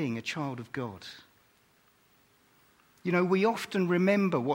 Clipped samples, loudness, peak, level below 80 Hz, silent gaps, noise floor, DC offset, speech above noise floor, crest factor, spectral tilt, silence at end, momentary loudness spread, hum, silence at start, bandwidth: under 0.1%; -29 LUFS; -12 dBFS; -74 dBFS; none; -66 dBFS; under 0.1%; 37 dB; 18 dB; -6.5 dB/octave; 0 s; 14 LU; none; 0 s; 16.5 kHz